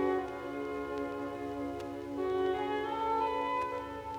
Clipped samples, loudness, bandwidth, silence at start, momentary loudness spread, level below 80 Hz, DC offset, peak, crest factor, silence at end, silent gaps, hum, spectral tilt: under 0.1%; -35 LUFS; 16.5 kHz; 0 s; 7 LU; -60 dBFS; under 0.1%; -20 dBFS; 14 dB; 0 s; none; none; -6 dB/octave